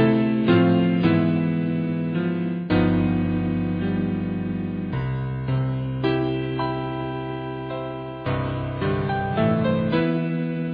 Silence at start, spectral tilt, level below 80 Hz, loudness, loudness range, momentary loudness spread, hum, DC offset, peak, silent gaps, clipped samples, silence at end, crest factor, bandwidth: 0 s; -11 dB/octave; -44 dBFS; -23 LUFS; 5 LU; 9 LU; none; under 0.1%; -6 dBFS; none; under 0.1%; 0 s; 16 dB; 5 kHz